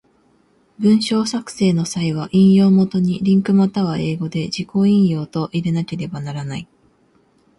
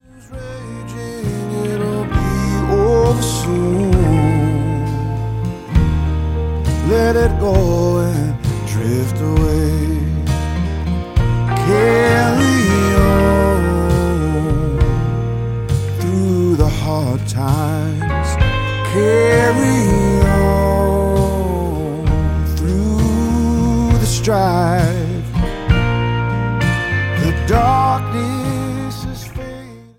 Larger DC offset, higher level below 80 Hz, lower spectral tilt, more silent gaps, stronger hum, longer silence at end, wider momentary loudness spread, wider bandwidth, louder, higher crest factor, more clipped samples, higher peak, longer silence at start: neither; second, -54 dBFS vs -22 dBFS; about the same, -7 dB/octave vs -6.5 dB/octave; neither; neither; first, 0.95 s vs 0.15 s; first, 13 LU vs 8 LU; second, 11.5 kHz vs 16.5 kHz; about the same, -17 LUFS vs -16 LUFS; about the same, 14 dB vs 14 dB; neither; second, -4 dBFS vs 0 dBFS; first, 0.8 s vs 0.25 s